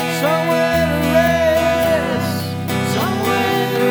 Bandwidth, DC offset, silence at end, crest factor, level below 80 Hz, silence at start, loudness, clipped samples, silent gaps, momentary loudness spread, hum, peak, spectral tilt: over 20 kHz; under 0.1%; 0 s; 16 dB; -38 dBFS; 0 s; -17 LUFS; under 0.1%; none; 6 LU; none; -2 dBFS; -5 dB/octave